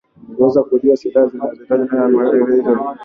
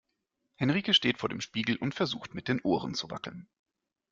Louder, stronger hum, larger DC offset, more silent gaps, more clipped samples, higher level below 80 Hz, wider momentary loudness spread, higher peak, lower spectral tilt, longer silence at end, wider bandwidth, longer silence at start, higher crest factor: first, -15 LUFS vs -30 LUFS; neither; neither; neither; neither; first, -56 dBFS vs -66 dBFS; second, 5 LU vs 15 LU; first, -2 dBFS vs -12 dBFS; first, -8.5 dB/octave vs -4.5 dB/octave; second, 0 s vs 0.7 s; second, 6.2 kHz vs 7.6 kHz; second, 0.3 s vs 0.6 s; second, 14 dB vs 22 dB